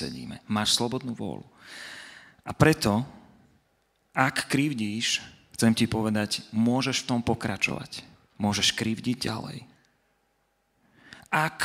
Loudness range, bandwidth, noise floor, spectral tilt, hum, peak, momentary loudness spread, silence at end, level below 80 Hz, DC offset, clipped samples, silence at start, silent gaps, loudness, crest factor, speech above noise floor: 4 LU; 16 kHz; -72 dBFS; -4 dB/octave; none; -4 dBFS; 17 LU; 0 s; -56 dBFS; under 0.1%; under 0.1%; 0 s; none; -26 LUFS; 26 dB; 45 dB